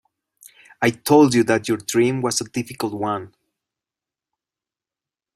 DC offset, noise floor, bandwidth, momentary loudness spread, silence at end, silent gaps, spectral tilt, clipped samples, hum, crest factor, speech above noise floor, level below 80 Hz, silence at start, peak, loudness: under 0.1%; -90 dBFS; 16 kHz; 12 LU; 2.1 s; none; -4.5 dB/octave; under 0.1%; none; 20 dB; 71 dB; -58 dBFS; 0.8 s; -2 dBFS; -20 LUFS